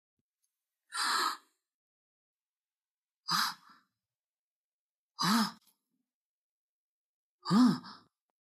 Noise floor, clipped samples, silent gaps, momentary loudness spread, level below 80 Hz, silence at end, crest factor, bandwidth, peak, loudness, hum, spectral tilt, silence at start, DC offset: under -90 dBFS; under 0.1%; 1.74-2.53 s, 2.59-2.64 s, 2.73-2.77 s, 2.91-3.07 s, 3.16-3.23 s, 4.19-5.10 s, 6.14-7.39 s; 19 LU; under -90 dBFS; 0.6 s; 22 dB; 15.5 kHz; -16 dBFS; -31 LUFS; none; -3.5 dB/octave; 0.9 s; under 0.1%